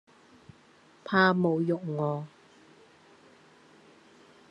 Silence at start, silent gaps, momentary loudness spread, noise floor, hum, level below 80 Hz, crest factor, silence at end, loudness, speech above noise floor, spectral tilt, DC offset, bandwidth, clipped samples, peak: 1.05 s; none; 19 LU; -59 dBFS; none; -76 dBFS; 22 dB; 2.25 s; -27 LUFS; 33 dB; -8 dB/octave; under 0.1%; 7.8 kHz; under 0.1%; -10 dBFS